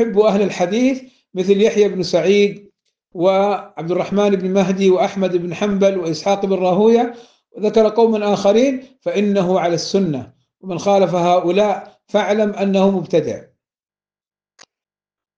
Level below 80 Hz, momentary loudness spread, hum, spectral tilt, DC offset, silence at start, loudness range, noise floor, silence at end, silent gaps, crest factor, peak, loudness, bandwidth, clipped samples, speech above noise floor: -58 dBFS; 9 LU; none; -6 dB/octave; under 0.1%; 0 s; 2 LU; under -90 dBFS; 1.95 s; none; 14 dB; -2 dBFS; -16 LUFS; 7.8 kHz; under 0.1%; over 74 dB